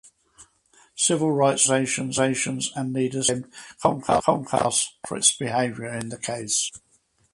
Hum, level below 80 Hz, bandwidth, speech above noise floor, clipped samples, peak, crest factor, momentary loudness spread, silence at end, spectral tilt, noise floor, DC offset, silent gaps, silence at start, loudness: none; -58 dBFS; 11.5 kHz; 35 dB; under 0.1%; -2 dBFS; 22 dB; 11 LU; 0.55 s; -3 dB/octave; -59 dBFS; under 0.1%; none; 0.4 s; -23 LUFS